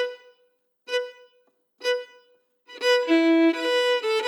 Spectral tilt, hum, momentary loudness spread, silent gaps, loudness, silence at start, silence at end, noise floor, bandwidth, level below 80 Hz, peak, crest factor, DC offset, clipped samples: -1 dB/octave; none; 11 LU; none; -23 LUFS; 0 s; 0 s; -68 dBFS; 12.5 kHz; under -90 dBFS; -10 dBFS; 16 dB; under 0.1%; under 0.1%